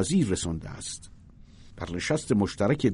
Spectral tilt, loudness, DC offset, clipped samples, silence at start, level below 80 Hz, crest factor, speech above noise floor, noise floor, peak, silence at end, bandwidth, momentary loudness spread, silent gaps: -5.5 dB/octave; -28 LUFS; under 0.1%; under 0.1%; 0 s; -48 dBFS; 18 dB; 23 dB; -50 dBFS; -10 dBFS; 0 s; 11 kHz; 12 LU; none